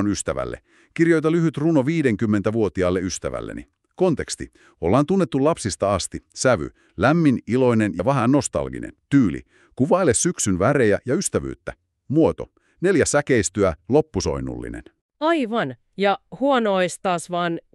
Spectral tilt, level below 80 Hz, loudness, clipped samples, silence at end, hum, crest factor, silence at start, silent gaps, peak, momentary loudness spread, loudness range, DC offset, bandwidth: -5.5 dB/octave; -46 dBFS; -21 LUFS; under 0.1%; 0.15 s; none; 18 dB; 0 s; 15.01-15.09 s; -4 dBFS; 13 LU; 3 LU; under 0.1%; 12.5 kHz